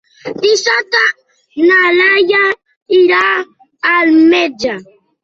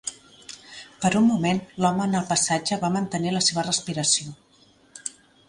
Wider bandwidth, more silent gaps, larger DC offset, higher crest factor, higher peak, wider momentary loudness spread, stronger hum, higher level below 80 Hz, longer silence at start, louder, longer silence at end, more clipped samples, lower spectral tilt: second, 7.6 kHz vs 11.5 kHz; first, 2.76-2.86 s vs none; neither; second, 12 dB vs 18 dB; first, 0 dBFS vs -6 dBFS; second, 16 LU vs 19 LU; neither; about the same, -58 dBFS vs -60 dBFS; first, 0.25 s vs 0.05 s; first, -11 LUFS vs -23 LUFS; about the same, 0.4 s vs 0.4 s; neither; about the same, -2.5 dB/octave vs -3.5 dB/octave